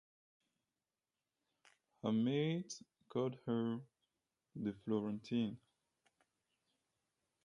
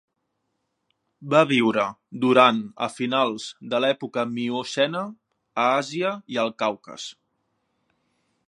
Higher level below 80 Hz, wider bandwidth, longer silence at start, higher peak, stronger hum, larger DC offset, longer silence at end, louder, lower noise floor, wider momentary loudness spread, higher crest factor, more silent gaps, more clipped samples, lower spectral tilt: second, -82 dBFS vs -74 dBFS; about the same, 10.5 kHz vs 11 kHz; first, 2.05 s vs 1.2 s; second, -24 dBFS vs 0 dBFS; neither; neither; first, 1.85 s vs 1.35 s; second, -41 LUFS vs -23 LUFS; first, under -90 dBFS vs -76 dBFS; second, 13 LU vs 16 LU; about the same, 20 dB vs 24 dB; neither; neither; first, -6.5 dB/octave vs -5 dB/octave